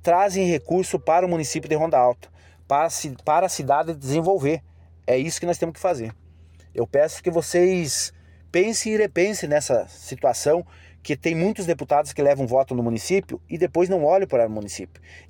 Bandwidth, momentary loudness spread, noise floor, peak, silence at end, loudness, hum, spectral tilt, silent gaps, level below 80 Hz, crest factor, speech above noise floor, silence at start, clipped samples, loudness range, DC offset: 17 kHz; 10 LU; -49 dBFS; -8 dBFS; 0.1 s; -22 LUFS; none; -5 dB/octave; none; -54 dBFS; 14 dB; 27 dB; 0.05 s; under 0.1%; 2 LU; under 0.1%